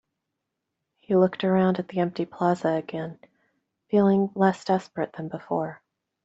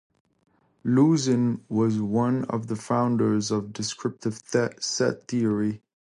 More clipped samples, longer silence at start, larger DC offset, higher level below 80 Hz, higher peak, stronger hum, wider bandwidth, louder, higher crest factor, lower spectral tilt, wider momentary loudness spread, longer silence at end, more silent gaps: neither; first, 1.1 s vs 0.85 s; neither; about the same, -68 dBFS vs -64 dBFS; about the same, -6 dBFS vs -8 dBFS; neither; second, 7.8 kHz vs 11 kHz; about the same, -25 LUFS vs -25 LUFS; about the same, 20 dB vs 16 dB; first, -8 dB/octave vs -5.5 dB/octave; first, 12 LU vs 9 LU; first, 0.5 s vs 0.25 s; neither